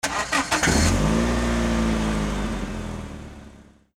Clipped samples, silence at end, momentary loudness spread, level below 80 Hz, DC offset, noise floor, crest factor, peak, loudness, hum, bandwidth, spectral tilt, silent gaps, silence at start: under 0.1%; 0.35 s; 15 LU; -30 dBFS; under 0.1%; -48 dBFS; 18 dB; -6 dBFS; -23 LUFS; none; 16.5 kHz; -4.5 dB/octave; none; 0.05 s